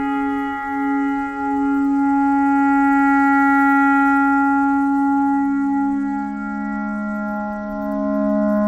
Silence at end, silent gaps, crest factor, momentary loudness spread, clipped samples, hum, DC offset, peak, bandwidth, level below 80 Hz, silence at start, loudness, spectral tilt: 0 s; none; 10 dB; 10 LU; under 0.1%; none; under 0.1%; -8 dBFS; 7.6 kHz; -48 dBFS; 0 s; -18 LUFS; -7.5 dB/octave